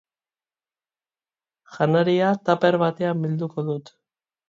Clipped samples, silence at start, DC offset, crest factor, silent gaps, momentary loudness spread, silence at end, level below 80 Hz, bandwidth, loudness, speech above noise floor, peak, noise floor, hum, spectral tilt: under 0.1%; 1.7 s; under 0.1%; 18 dB; none; 9 LU; 0.7 s; -70 dBFS; 7.4 kHz; -22 LUFS; over 69 dB; -6 dBFS; under -90 dBFS; none; -8 dB/octave